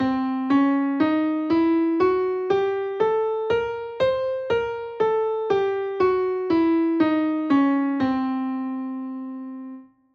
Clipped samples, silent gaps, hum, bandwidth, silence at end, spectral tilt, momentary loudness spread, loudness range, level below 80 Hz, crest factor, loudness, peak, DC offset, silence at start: under 0.1%; none; none; 6.4 kHz; 0.3 s; -7.5 dB/octave; 10 LU; 2 LU; -58 dBFS; 14 dB; -23 LUFS; -8 dBFS; under 0.1%; 0 s